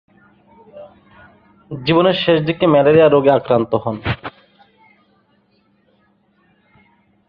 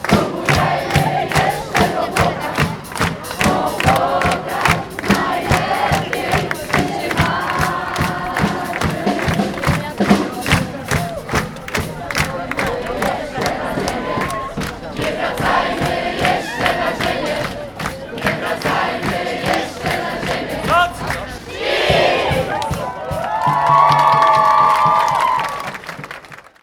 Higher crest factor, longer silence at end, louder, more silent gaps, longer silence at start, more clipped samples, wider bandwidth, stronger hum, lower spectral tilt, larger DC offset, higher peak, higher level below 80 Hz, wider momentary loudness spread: about the same, 18 dB vs 18 dB; first, 3 s vs 0.2 s; about the same, -15 LUFS vs -17 LUFS; neither; first, 0.75 s vs 0 s; neither; second, 5.4 kHz vs 19.5 kHz; neither; first, -9 dB/octave vs -4.5 dB/octave; neither; about the same, 0 dBFS vs 0 dBFS; second, -48 dBFS vs -36 dBFS; first, 14 LU vs 10 LU